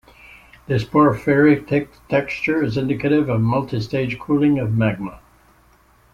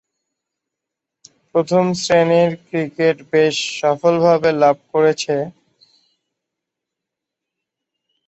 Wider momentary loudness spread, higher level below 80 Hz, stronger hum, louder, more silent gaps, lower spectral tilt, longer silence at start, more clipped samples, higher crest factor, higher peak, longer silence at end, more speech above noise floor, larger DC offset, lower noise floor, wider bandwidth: about the same, 8 LU vs 8 LU; first, -48 dBFS vs -62 dBFS; neither; second, -19 LUFS vs -16 LUFS; neither; first, -8.5 dB/octave vs -5 dB/octave; second, 0.7 s vs 1.55 s; neither; about the same, 16 dB vs 16 dB; about the same, -2 dBFS vs -2 dBFS; second, 0.95 s vs 2.75 s; second, 36 dB vs 67 dB; neither; second, -54 dBFS vs -83 dBFS; second, 7.2 kHz vs 8.2 kHz